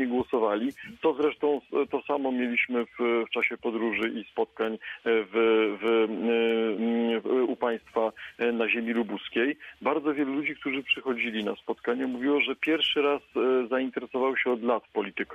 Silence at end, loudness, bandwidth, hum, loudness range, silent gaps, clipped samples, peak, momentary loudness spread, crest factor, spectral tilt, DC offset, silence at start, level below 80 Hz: 0 s; -27 LUFS; 6.6 kHz; none; 2 LU; none; under 0.1%; -12 dBFS; 6 LU; 14 dB; -6 dB/octave; under 0.1%; 0 s; -68 dBFS